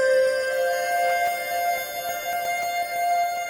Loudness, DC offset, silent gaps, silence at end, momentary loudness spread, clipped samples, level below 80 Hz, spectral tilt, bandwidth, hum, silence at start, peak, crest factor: -24 LUFS; under 0.1%; none; 0 s; 6 LU; under 0.1%; -64 dBFS; 0 dB/octave; 17 kHz; none; 0 s; -12 dBFS; 12 dB